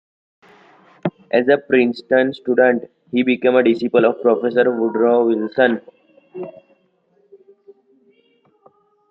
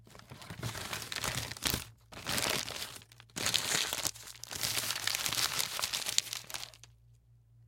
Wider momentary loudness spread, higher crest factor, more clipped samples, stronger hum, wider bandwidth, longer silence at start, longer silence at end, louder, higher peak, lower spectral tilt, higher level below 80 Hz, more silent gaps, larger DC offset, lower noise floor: second, 12 LU vs 15 LU; second, 18 dB vs 34 dB; neither; neither; second, 5.6 kHz vs 17 kHz; first, 1.05 s vs 0 s; first, 2.6 s vs 0 s; first, -17 LUFS vs -34 LUFS; about the same, 0 dBFS vs -2 dBFS; first, -8 dB/octave vs -1 dB/octave; second, -68 dBFS vs -60 dBFS; neither; neither; about the same, -61 dBFS vs -62 dBFS